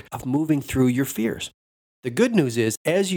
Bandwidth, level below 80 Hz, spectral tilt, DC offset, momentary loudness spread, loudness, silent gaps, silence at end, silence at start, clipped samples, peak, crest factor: over 20 kHz; -50 dBFS; -5.5 dB/octave; under 0.1%; 11 LU; -23 LUFS; 1.54-2.03 s, 2.77-2.85 s; 0 s; 0.1 s; under 0.1%; -4 dBFS; 18 dB